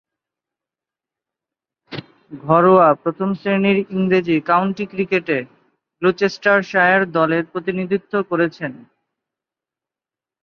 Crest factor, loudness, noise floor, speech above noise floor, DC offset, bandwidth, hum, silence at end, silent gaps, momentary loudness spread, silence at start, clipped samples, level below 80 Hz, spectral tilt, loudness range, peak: 20 dB; -17 LUFS; -89 dBFS; 72 dB; under 0.1%; 6.8 kHz; none; 1.65 s; none; 13 LU; 1.9 s; under 0.1%; -62 dBFS; -7.5 dB/octave; 3 LU; 0 dBFS